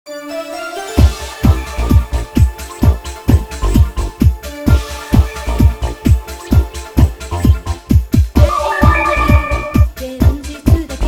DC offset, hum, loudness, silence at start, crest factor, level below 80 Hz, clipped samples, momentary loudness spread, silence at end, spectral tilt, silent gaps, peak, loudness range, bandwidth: under 0.1%; none; -15 LUFS; 0.05 s; 12 dB; -16 dBFS; 0.6%; 7 LU; 0 s; -6.5 dB/octave; none; 0 dBFS; 2 LU; 16 kHz